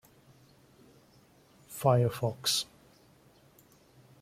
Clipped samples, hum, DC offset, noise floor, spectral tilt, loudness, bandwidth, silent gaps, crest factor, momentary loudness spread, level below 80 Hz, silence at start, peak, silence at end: under 0.1%; none; under 0.1%; -62 dBFS; -4.5 dB/octave; -29 LUFS; 16 kHz; none; 24 dB; 15 LU; -68 dBFS; 1.7 s; -12 dBFS; 1.6 s